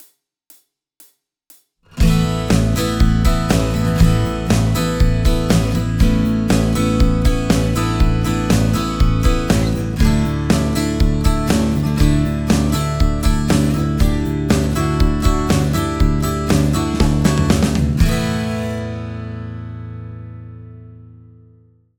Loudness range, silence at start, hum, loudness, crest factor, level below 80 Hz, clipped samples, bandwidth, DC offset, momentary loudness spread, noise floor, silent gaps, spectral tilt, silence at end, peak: 4 LU; 1.95 s; none; -17 LUFS; 16 dB; -22 dBFS; under 0.1%; over 20 kHz; under 0.1%; 10 LU; -51 dBFS; none; -6 dB/octave; 0.95 s; 0 dBFS